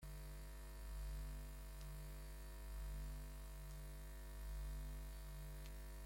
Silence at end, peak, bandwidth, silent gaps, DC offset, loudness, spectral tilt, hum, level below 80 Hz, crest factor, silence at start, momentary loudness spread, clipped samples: 0 s; -40 dBFS; 16.5 kHz; none; under 0.1%; -54 LUFS; -5 dB/octave; 50 Hz at -50 dBFS; -52 dBFS; 10 dB; 0 s; 4 LU; under 0.1%